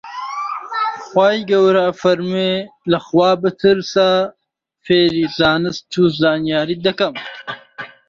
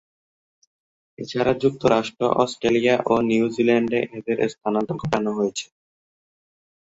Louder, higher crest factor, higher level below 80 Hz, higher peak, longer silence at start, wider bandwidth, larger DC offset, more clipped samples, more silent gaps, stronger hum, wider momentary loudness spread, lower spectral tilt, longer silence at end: first, -16 LUFS vs -22 LUFS; about the same, 16 dB vs 20 dB; about the same, -54 dBFS vs -56 dBFS; about the same, -2 dBFS vs -2 dBFS; second, 0.05 s vs 1.2 s; about the same, 7.4 kHz vs 8 kHz; neither; neither; neither; neither; first, 11 LU vs 7 LU; about the same, -6 dB/octave vs -5.5 dB/octave; second, 0.2 s vs 1.2 s